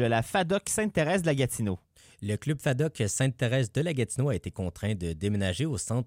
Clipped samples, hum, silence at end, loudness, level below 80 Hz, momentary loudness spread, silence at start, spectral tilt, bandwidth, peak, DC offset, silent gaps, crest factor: under 0.1%; none; 0 s; -29 LUFS; -52 dBFS; 7 LU; 0 s; -5 dB/octave; 16.5 kHz; -12 dBFS; under 0.1%; none; 16 dB